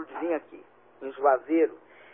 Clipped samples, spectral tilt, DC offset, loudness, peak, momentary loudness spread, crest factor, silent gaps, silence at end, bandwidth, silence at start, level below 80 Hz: under 0.1%; -9 dB/octave; under 0.1%; -27 LUFS; -8 dBFS; 15 LU; 20 dB; none; 0.35 s; 3.6 kHz; 0 s; -84 dBFS